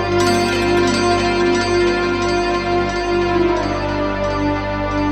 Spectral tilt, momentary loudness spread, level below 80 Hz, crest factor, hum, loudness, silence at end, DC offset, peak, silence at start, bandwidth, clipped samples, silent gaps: -5 dB/octave; 4 LU; -32 dBFS; 14 dB; 50 Hz at -35 dBFS; -17 LUFS; 0 s; under 0.1%; -4 dBFS; 0 s; 12.5 kHz; under 0.1%; none